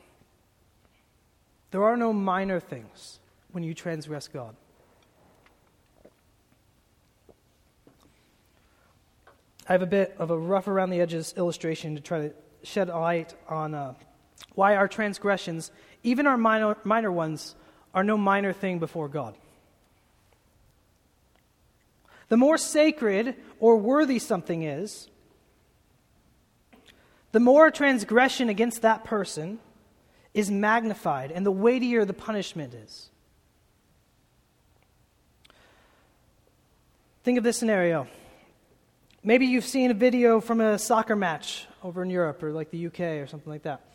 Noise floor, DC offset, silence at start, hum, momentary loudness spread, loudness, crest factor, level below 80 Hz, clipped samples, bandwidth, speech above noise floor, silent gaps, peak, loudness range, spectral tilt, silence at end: -65 dBFS; under 0.1%; 1.7 s; none; 16 LU; -25 LUFS; 24 dB; -66 dBFS; under 0.1%; 16.5 kHz; 40 dB; none; -4 dBFS; 12 LU; -5 dB/octave; 0.15 s